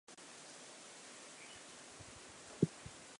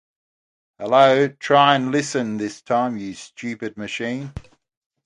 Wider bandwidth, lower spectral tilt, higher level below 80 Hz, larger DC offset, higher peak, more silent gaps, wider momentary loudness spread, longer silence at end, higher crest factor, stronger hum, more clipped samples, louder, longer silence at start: about the same, 11 kHz vs 10.5 kHz; about the same, -5 dB/octave vs -4.5 dB/octave; second, -72 dBFS vs -54 dBFS; neither; second, -18 dBFS vs 0 dBFS; neither; second, 14 LU vs 17 LU; second, 0 s vs 0.65 s; first, 30 dB vs 20 dB; neither; neither; second, -47 LUFS vs -19 LUFS; second, 0.1 s vs 0.8 s